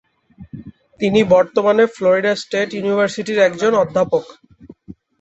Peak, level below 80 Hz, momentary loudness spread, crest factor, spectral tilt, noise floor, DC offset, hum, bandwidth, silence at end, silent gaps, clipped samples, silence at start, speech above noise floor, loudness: -2 dBFS; -54 dBFS; 12 LU; 16 dB; -5.5 dB/octave; -43 dBFS; under 0.1%; none; 8.2 kHz; 0.3 s; none; under 0.1%; 0.4 s; 28 dB; -16 LUFS